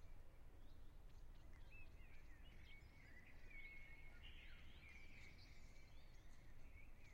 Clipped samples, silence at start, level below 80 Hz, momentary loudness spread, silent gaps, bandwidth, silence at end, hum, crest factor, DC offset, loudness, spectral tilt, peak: under 0.1%; 0 s; -62 dBFS; 7 LU; none; 16 kHz; 0 s; none; 12 dB; under 0.1%; -65 LUFS; -4.5 dB/octave; -46 dBFS